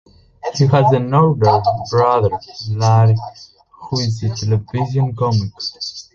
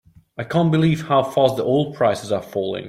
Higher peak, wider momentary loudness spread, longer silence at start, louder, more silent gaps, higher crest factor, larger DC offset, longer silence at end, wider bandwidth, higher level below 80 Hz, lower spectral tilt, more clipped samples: about the same, 0 dBFS vs -2 dBFS; first, 12 LU vs 8 LU; about the same, 0.45 s vs 0.4 s; first, -16 LUFS vs -19 LUFS; neither; about the same, 16 dB vs 16 dB; neither; first, 0.15 s vs 0 s; second, 7.2 kHz vs 14.5 kHz; first, -44 dBFS vs -56 dBFS; about the same, -7 dB/octave vs -7 dB/octave; neither